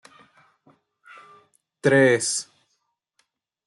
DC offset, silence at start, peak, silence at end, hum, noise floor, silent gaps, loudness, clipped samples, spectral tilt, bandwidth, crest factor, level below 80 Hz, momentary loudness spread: under 0.1%; 1.85 s; -6 dBFS; 1.25 s; none; -75 dBFS; none; -20 LUFS; under 0.1%; -4 dB/octave; 12 kHz; 20 dB; -70 dBFS; 13 LU